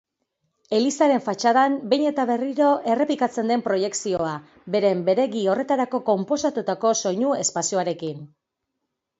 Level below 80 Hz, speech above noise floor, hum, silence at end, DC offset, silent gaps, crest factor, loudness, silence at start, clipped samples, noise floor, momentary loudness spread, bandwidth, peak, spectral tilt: -66 dBFS; 58 dB; none; 0.95 s; under 0.1%; none; 16 dB; -22 LUFS; 0.7 s; under 0.1%; -80 dBFS; 6 LU; 8 kHz; -6 dBFS; -4 dB/octave